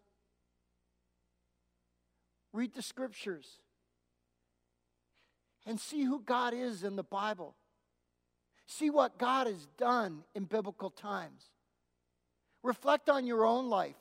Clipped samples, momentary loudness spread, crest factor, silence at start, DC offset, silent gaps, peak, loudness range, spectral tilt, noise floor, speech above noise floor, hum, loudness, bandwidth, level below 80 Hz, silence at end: under 0.1%; 14 LU; 22 dB; 2.55 s; under 0.1%; none; -14 dBFS; 10 LU; -4.5 dB/octave; -83 dBFS; 48 dB; 60 Hz at -70 dBFS; -35 LUFS; 16 kHz; -86 dBFS; 0.05 s